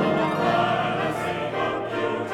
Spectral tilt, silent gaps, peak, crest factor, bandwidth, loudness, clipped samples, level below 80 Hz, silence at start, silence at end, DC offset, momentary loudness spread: -6 dB/octave; none; -10 dBFS; 14 dB; 16 kHz; -24 LUFS; under 0.1%; -56 dBFS; 0 s; 0 s; under 0.1%; 5 LU